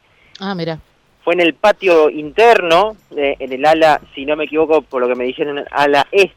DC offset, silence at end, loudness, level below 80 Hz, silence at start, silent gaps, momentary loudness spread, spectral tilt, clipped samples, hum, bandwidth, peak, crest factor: under 0.1%; 0.1 s; -14 LUFS; -50 dBFS; 0.4 s; none; 12 LU; -4.5 dB/octave; under 0.1%; none; 15.5 kHz; -2 dBFS; 12 dB